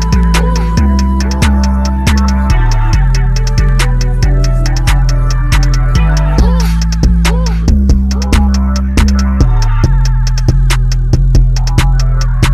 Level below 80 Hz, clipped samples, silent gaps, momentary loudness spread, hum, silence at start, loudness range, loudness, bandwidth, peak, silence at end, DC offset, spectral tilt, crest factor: -10 dBFS; under 0.1%; none; 2 LU; none; 0 s; 1 LU; -12 LUFS; 13 kHz; 0 dBFS; 0 s; under 0.1%; -6 dB/octave; 8 dB